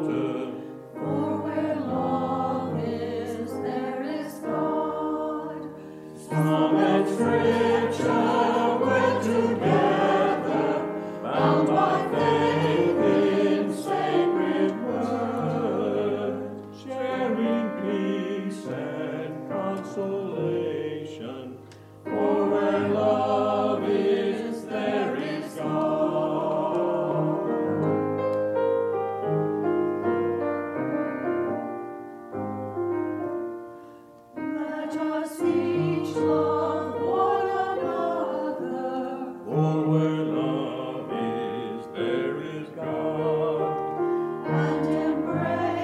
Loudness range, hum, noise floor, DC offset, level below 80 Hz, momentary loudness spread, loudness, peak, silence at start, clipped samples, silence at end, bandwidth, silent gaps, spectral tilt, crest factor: 7 LU; none; -48 dBFS; under 0.1%; -68 dBFS; 11 LU; -26 LUFS; -8 dBFS; 0 s; under 0.1%; 0 s; 13.5 kHz; none; -7 dB/octave; 18 dB